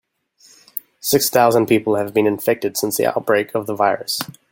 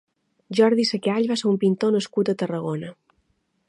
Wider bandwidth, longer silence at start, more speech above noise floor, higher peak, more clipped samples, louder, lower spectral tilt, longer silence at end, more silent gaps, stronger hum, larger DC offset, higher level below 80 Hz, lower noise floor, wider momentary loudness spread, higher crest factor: first, 17 kHz vs 11 kHz; first, 0.75 s vs 0.5 s; second, 36 dB vs 48 dB; first, -2 dBFS vs -6 dBFS; neither; first, -18 LUFS vs -22 LUFS; second, -4 dB/octave vs -6 dB/octave; second, 0.2 s vs 0.75 s; neither; neither; neither; first, -62 dBFS vs -72 dBFS; second, -53 dBFS vs -69 dBFS; about the same, 10 LU vs 10 LU; about the same, 18 dB vs 18 dB